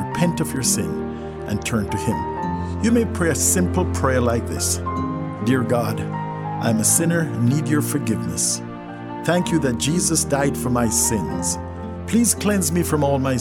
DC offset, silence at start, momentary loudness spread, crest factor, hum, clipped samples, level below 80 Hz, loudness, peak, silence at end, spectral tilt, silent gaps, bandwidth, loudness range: under 0.1%; 0 s; 9 LU; 18 dB; none; under 0.1%; -40 dBFS; -20 LUFS; -2 dBFS; 0 s; -4.5 dB/octave; none; 16.5 kHz; 2 LU